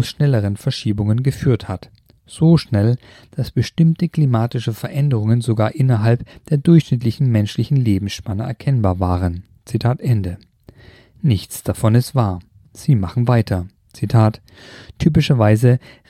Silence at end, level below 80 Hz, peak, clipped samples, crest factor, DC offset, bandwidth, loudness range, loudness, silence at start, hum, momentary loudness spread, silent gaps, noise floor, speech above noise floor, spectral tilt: 0.3 s; -42 dBFS; -2 dBFS; under 0.1%; 16 dB; under 0.1%; 14.5 kHz; 4 LU; -18 LUFS; 0 s; none; 11 LU; none; -46 dBFS; 29 dB; -7.5 dB/octave